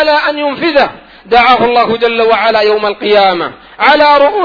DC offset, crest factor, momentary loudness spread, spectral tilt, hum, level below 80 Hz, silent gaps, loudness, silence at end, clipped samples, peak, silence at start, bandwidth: under 0.1%; 10 dB; 7 LU; -5.5 dB/octave; none; -42 dBFS; none; -9 LUFS; 0 s; 0.6%; 0 dBFS; 0 s; 5.4 kHz